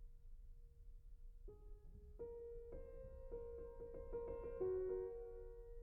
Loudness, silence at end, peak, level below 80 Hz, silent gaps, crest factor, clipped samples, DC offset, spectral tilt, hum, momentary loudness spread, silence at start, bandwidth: -50 LUFS; 0 s; -34 dBFS; -58 dBFS; none; 16 dB; under 0.1%; under 0.1%; -7.5 dB/octave; none; 21 LU; 0 s; 2.8 kHz